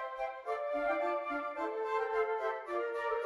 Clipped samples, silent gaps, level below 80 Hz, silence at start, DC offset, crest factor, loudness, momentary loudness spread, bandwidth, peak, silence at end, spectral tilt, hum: under 0.1%; none; -70 dBFS; 0 s; under 0.1%; 14 dB; -36 LUFS; 5 LU; 11.5 kHz; -22 dBFS; 0 s; -4 dB/octave; none